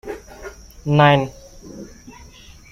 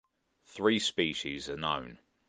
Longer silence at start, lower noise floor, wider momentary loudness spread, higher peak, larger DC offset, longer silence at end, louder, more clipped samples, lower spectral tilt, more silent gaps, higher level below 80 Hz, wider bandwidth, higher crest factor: second, 0.05 s vs 0.5 s; second, -43 dBFS vs -66 dBFS; first, 25 LU vs 14 LU; first, -2 dBFS vs -14 dBFS; neither; first, 0.9 s vs 0.35 s; first, -16 LUFS vs -31 LUFS; neither; first, -6.5 dB/octave vs -3.5 dB/octave; neither; first, -46 dBFS vs -62 dBFS; first, 14 kHz vs 9.8 kHz; about the same, 20 dB vs 20 dB